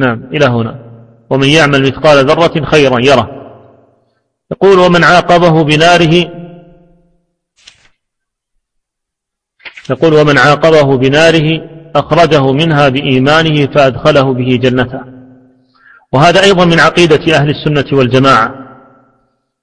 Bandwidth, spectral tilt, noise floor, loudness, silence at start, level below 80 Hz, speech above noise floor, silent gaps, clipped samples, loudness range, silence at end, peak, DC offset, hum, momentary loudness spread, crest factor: 11 kHz; -5.5 dB/octave; -77 dBFS; -8 LUFS; 0 s; -38 dBFS; 69 dB; none; 1%; 4 LU; 1 s; 0 dBFS; under 0.1%; none; 10 LU; 10 dB